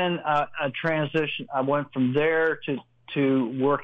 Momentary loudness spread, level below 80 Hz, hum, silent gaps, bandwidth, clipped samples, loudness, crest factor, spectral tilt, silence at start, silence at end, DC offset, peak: 7 LU; -64 dBFS; none; none; 5.8 kHz; under 0.1%; -25 LUFS; 14 dB; -8 dB/octave; 0 s; 0 s; under 0.1%; -12 dBFS